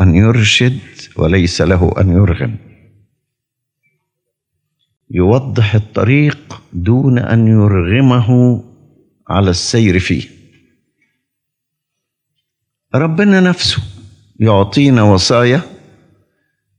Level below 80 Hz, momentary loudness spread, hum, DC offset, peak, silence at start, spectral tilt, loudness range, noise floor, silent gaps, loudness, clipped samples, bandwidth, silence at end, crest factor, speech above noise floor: -38 dBFS; 11 LU; none; under 0.1%; 0 dBFS; 0 s; -6 dB/octave; 7 LU; -76 dBFS; none; -12 LUFS; under 0.1%; 10.5 kHz; 1.1 s; 14 dB; 66 dB